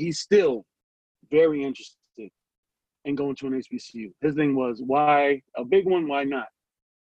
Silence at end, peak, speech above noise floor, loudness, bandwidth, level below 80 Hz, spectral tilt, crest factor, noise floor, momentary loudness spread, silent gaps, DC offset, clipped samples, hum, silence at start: 0.65 s; -8 dBFS; 22 dB; -24 LUFS; 9 kHz; -66 dBFS; -5.5 dB/octave; 16 dB; -45 dBFS; 18 LU; 0.83-1.15 s, 2.58-2.63 s; under 0.1%; under 0.1%; none; 0 s